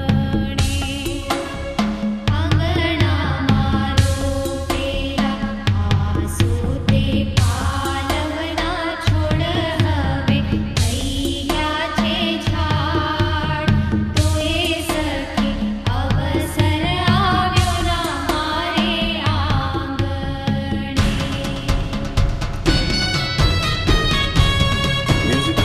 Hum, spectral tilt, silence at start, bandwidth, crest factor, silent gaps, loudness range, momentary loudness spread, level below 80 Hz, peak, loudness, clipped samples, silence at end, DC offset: none; -5.5 dB/octave; 0 s; 14 kHz; 16 dB; none; 2 LU; 5 LU; -26 dBFS; -2 dBFS; -19 LUFS; under 0.1%; 0 s; under 0.1%